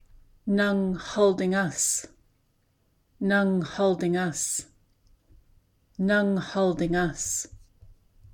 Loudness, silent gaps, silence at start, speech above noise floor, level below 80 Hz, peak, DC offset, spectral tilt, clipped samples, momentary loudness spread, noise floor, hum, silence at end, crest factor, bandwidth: -26 LUFS; none; 0.45 s; 43 dB; -52 dBFS; -10 dBFS; under 0.1%; -4.5 dB/octave; under 0.1%; 7 LU; -68 dBFS; none; 0.4 s; 18 dB; 17.5 kHz